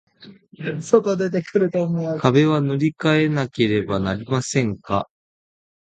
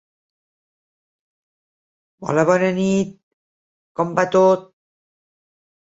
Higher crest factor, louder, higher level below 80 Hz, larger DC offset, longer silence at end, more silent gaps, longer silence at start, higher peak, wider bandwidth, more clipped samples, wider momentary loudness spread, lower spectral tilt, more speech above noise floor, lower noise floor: about the same, 20 dB vs 20 dB; about the same, -20 LUFS vs -18 LUFS; first, -52 dBFS vs -62 dBFS; neither; second, 0.8 s vs 1.2 s; second, none vs 3.23-3.95 s; second, 0.2 s vs 2.2 s; about the same, 0 dBFS vs -2 dBFS; first, 9.4 kHz vs 8 kHz; neither; second, 8 LU vs 13 LU; about the same, -6.5 dB/octave vs -6.5 dB/octave; second, 27 dB vs over 73 dB; second, -46 dBFS vs under -90 dBFS